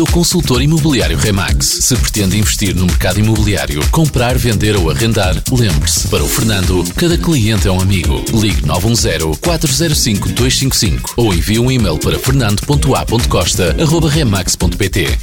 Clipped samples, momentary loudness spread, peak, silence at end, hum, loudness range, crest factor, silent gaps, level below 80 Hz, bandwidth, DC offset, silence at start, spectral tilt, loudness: under 0.1%; 3 LU; -2 dBFS; 0 s; none; 1 LU; 10 dB; none; -20 dBFS; 19 kHz; 1%; 0 s; -4.5 dB/octave; -12 LUFS